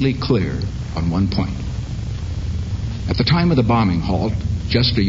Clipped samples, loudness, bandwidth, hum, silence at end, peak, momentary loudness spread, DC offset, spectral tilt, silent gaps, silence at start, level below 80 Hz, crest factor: under 0.1%; -20 LUFS; 7.8 kHz; none; 0 s; -2 dBFS; 11 LU; under 0.1%; -7 dB/octave; none; 0 s; -28 dBFS; 16 dB